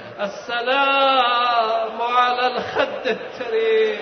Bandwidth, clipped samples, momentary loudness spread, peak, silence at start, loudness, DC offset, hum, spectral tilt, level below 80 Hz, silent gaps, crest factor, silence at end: 6.6 kHz; under 0.1%; 9 LU; -6 dBFS; 0 s; -19 LUFS; under 0.1%; none; -3.5 dB/octave; -64 dBFS; none; 14 dB; 0 s